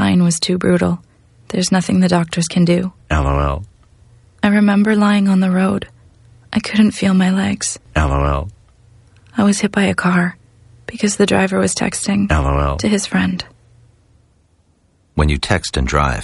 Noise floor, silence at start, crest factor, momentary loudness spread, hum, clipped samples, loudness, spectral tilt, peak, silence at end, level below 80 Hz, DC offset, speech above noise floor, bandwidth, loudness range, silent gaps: -57 dBFS; 0 s; 16 dB; 10 LU; none; under 0.1%; -16 LUFS; -5.5 dB/octave; 0 dBFS; 0 s; -28 dBFS; under 0.1%; 42 dB; 11.5 kHz; 4 LU; none